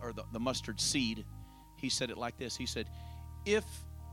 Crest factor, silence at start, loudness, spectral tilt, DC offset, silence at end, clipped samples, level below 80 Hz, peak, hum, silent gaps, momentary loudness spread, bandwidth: 20 dB; 0 s; -36 LUFS; -3.5 dB/octave; under 0.1%; 0 s; under 0.1%; -52 dBFS; -18 dBFS; none; none; 16 LU; 17.5 kHz